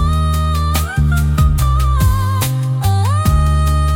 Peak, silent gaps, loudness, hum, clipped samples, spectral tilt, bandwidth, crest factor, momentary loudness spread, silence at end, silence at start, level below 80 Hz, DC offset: -2 dBFS; none; -15 LUFS; none; under 0.1%; -6 dB/octave; 17 kHz; 12 dB; 3 LU; 0 s; 0 s; -18 dBFS; under 0.1%